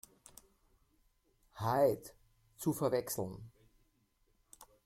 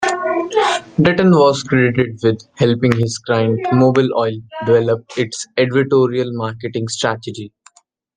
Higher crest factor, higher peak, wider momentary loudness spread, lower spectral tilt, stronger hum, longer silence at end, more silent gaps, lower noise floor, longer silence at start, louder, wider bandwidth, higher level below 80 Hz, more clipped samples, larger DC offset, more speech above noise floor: first, 22 dB vs 16 dB; second, -18 dBFS vs 0 dBFS; first, 22 LU vs 10 LU; about the same, -5.5 dB/octave vs -6 dB/octave; neither; second, 0.2 s vs 0.7 s; neither; first, -75 dBFS vs -51 dBFS; first, 1.55 s vs 0 s; second, -36 LUFS vs -16 LUFS; first, 16.5 kHz vs 10 kHz; second, -68 dBFS vs -52 dBFS; neither; neither; first, 41 dB vs 36 dB